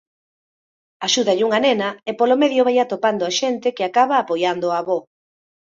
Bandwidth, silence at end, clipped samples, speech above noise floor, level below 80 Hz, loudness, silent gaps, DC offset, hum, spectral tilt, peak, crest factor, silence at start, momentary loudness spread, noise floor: 7.8 kHz; 0.75 s; under 0.1%; over 72 dB; -68 dBFS; -19 LUFS; none; under 0.1%; none; -3 dB/octave; -4 dBFS; 16 dB; 1 s; 6 LU; under -90 dBFS